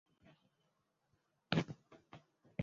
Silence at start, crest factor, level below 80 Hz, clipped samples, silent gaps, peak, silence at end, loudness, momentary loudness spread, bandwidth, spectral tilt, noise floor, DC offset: 1.5 s; 30 dB; -74 dBFS; under 0.1%; none; -16 dBFS; 0 s; -41 LUFS; 23 LU; 7.4 kHz; -5 dB/octave; -82 dBFS; under 0.1%